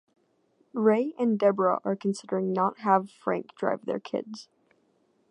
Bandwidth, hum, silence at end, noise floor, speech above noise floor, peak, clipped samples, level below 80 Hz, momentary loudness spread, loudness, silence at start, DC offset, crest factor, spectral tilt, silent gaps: 10.5 kHz; none; 0.9 s; -68 dBFS; 42 dB; -8 dBFS; under 0.1%; -80 dBFS; 11 LU; -27 LUFS; 0.75 s; under 0.1%; 20 dB; -7 dB/octave; none